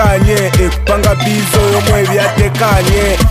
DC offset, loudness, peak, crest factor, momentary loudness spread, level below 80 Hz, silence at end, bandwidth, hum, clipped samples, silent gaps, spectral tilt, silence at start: under 0.1%; -11 LUFS; 0 dBFS; 10 dB; 2 LU; -18 dBFS; 0 s; 16 kHz; none; under 0.1%; none; -5 dB/octave; 0 s